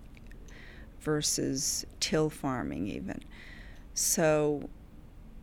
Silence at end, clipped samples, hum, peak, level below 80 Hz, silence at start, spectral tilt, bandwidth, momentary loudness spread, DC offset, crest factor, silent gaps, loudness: 0 s; under 0.1%; none; -14 dBFS; -50 dBFS; 0 s; -3.5 dB/octave; 20 kHz; 24 LU; under 0.1%; 18 dB; none; -30 LUFS